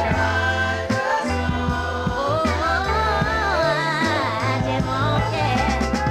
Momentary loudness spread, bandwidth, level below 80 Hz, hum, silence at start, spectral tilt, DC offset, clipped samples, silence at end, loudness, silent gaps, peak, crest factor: 3 LU; 15 kHz; -32 dBFS; none; 0 s; -5.5 dB/octave; under 0.1%; under 0.1%; 0 s; -21 LUFS; none; -8 dBFS; 14 dB